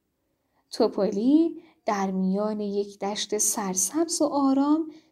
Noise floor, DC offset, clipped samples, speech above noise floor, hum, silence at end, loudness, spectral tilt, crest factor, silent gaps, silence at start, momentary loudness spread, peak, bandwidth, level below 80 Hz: -75 dBFS; under 0.1%; under 0.1%; 50 dB; none; 0.15 s; -25 LUFS; -4 dB/octave; 16 dB; none; 0.7 s; 8 LU; -10 dBFS; 16 kHz; -70 dBFS